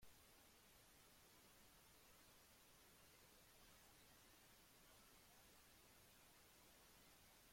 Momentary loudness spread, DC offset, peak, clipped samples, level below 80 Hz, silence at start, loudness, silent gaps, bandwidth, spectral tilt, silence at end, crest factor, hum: 1 LU; under 0.1%; -54 dBFS; under 0.1%; -82 dBFS; 0 s; -69 LUFS; none; 16.5 kHz; -2 dB/octave; 0 s; 16 dB; none